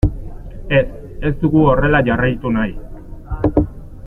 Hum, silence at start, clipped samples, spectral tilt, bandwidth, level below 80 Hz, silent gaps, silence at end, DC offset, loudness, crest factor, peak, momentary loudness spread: none; 0.05 s; under 0.1%; -9.5 dB/octave; 4.3 kHz; -26 dBFS; none; 0 s; under 0.1%; -17 LUFS; 16 dB; -2 dBFS; 22 LU